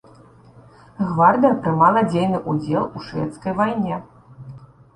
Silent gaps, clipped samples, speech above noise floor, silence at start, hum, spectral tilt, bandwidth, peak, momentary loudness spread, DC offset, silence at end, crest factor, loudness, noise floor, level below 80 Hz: none; under 0.1%; 29 dB; 1 s; none; -8 dB/octave; 11 kHz; -2 dBFS; 14 LU; under 0.1%; 0.3 s; 18 dB; -19 LUFS; -48 dBFS; -54 dBFS